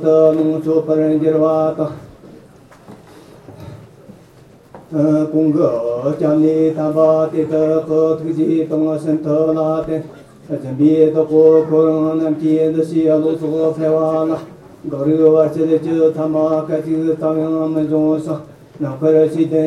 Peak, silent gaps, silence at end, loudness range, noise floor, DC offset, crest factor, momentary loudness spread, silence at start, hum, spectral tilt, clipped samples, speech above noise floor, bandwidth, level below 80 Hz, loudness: 0 dBFS; none; 0 s; 6 LU; -44 dBFS; under 0.1%; 14 dB; 12 LU; 0 s; none; -9.5 dB/octave; under 0.1%; 30 dB; 9.6 kHz; -56 dBFS; -15 LUFS